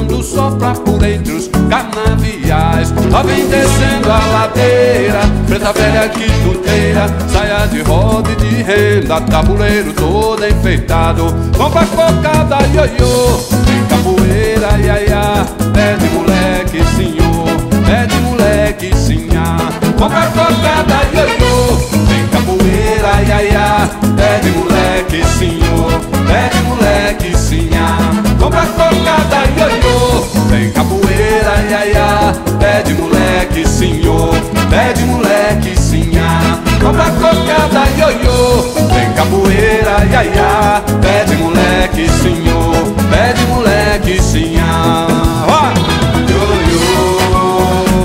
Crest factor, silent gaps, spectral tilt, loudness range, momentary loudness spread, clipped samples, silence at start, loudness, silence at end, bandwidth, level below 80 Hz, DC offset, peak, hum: 10 dB; none; -5.5 dB/octave; 2 LU; 3 LU; under 0.1%; 0 s; -11 LUFS; 0 s; 16.5 kHz; -18 dBFS; under 0.1%; 0 dBFS; none